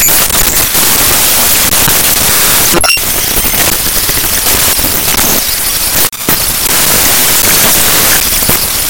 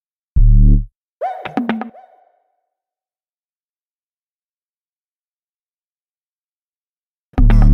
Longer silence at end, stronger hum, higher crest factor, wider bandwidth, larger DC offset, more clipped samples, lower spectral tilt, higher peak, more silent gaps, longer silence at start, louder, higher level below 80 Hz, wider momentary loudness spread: about the same, 0 s vs 0 s; neither; second, 8 dB vs 16 dB; first, over 20 kHz vs 3.9 kHz; first, 4% vs under 0.1%; first, 1% vs under 0.1%; second, -1 dB/octave vs -9.5 dB/octave; about the same, 0 dBFS vs -2 dBFS; second, none vs 0.95-1.21 s, 3.29-7.33 s; second, 0 s vs 0.35 s; first, -6 LUFS vs -18 LUFS; second, -24 dBFS vs -18 dBFS; second, 3 LU vs 13 LU